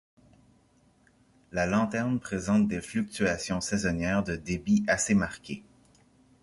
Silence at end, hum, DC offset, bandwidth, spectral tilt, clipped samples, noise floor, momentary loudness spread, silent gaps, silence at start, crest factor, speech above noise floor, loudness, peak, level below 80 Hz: 0.85 s; none; under 0.1%; 11.5 kHz; -5 dB/octave; under 0.1%; -64 dBFS; 9 LU; none; 1.55 s; 18 dB; 36 dB; -28 LUFS; -12 dBFS; -52 dBFS